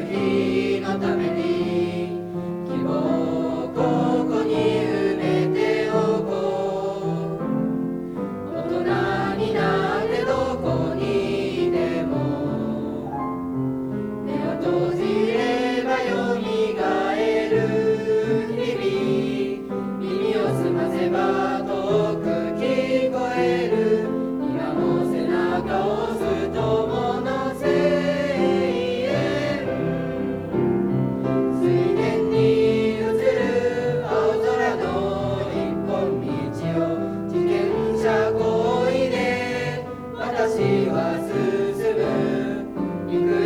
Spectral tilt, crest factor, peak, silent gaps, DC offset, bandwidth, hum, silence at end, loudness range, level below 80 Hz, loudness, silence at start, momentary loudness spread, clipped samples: -7 dB/octave; 14 dB; -8 dBFS; none; under 0.1%; 14 kHz; none; 0 s; 3 LU; -50 dBFS; -23 LUFS; 0 s; 6 LU; under 0.1%